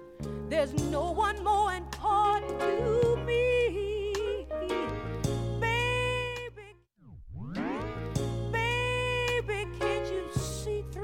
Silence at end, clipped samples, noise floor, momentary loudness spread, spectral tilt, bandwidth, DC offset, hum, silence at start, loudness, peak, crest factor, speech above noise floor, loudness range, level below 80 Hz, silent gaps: 0 s; under 0.1%; -54 dBFS; 9 LU; -5 dB/octave; 16.5 kHz; under 0.1%; none; 0 s; -30 LUFS; -14 dBFS; 16 dB; 26 dB; 5 LU; -44 dBFS; none